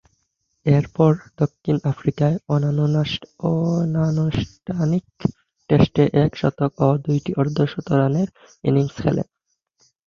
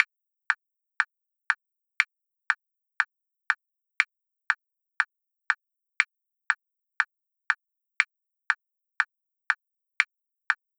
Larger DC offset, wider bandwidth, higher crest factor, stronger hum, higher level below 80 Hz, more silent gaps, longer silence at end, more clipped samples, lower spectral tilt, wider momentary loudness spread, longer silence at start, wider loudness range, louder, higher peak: neither; second, 7 kHz vs 15.5 kHz; second, 18 dB vs 30 dB; neither; first, -46 dBFS vs -90 dBFS; neither; first, 0.85 s vs 0.25 s; neither; first, -8.5 dB/octave vs 3.5 dB/octave; first, 9 LU vs 2 LU; first, 0.65 s vs 0 s; about the same, 2 LU vs 0 LU; first, -21 LUFS vs -29 LUFS; about the same, -2 dBFS vs -2 dBFS